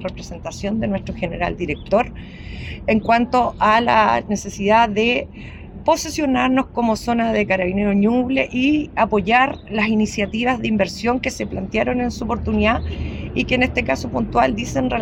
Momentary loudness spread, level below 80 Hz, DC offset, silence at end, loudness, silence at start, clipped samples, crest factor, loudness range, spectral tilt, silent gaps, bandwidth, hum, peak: 11 LU; -36 dBFS; under 0.1%; 0 s; -19 LUFS; 0 s; under 0.1%; 16 dB; 3 LU; -5.5 dB/octave; none; 16 kHz; none; -2 dBFS